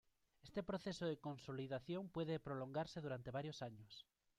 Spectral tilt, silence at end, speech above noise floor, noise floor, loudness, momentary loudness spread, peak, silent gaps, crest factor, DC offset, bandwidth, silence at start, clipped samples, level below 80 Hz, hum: -6.5 dB/octave; 0.35 s; 21 dB; -68 dBFS; -48 LUFS; 9 LU; -32 dBFS; none; 16 dB; under 0.1%; 13.5 kHz; 0.45 s; under 0.1%; -74 dBFS; none